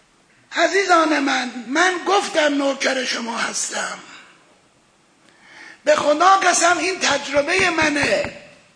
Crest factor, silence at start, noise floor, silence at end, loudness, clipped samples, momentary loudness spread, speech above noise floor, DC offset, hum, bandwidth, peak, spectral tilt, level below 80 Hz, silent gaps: 18 dB; 0.5 s; -57 dBFS; 0.3 s; -18 LUFS; under 0.1%; 9 LU; 38 dB; under 0.1%; none; 10.5 kHz; -2 dBFS; -1.5 dB/octave; -56 dBFS; none